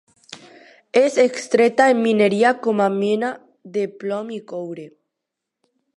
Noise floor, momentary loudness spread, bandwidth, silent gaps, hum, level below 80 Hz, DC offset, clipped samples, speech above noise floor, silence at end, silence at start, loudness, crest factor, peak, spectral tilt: -82 dBFS; 17 LU; 11.5 kHz; none; none; -74 dBFS; under 0.1%; under 0.1%; 64 dB; 1.1 s; 0.3 s; -19 LUFS; 18 dB; -2 dBFS; -5 dB/octave